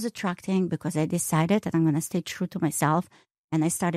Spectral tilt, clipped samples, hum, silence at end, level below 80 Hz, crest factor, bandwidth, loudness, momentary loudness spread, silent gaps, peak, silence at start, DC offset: -5.5 dB/octave; under 0.1%; none; 0 s; -64 dBFS; 14 dB; 15.5 kHz; -26 LUFS; 7 LU; 3.38-3.48 s; -12 dBFS; 0 s; under 0.1%